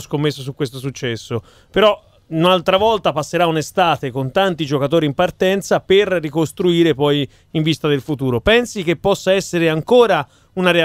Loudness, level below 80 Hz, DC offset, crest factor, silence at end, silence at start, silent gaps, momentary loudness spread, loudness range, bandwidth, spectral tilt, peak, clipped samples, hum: -17 LUFS; -46 dBFS; under 0.1%; 16 dB; 0 s; 0 s; none; 10 LU; 1 LU; 16 kHz; -5.5 dB/octave; 0 dBFS; under 0.1%; none